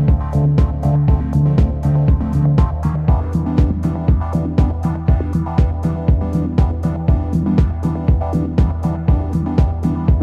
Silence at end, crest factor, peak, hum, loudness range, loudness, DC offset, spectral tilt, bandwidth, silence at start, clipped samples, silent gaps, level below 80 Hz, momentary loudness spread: 0 s; 12 dB; -2 dBFS; none; 2 LU; -17 LUFS; under 0.1%; -10 dB/octave; 6.8 kHz; 0 s; under 0.1%; none; -20 dBFS; 3 LU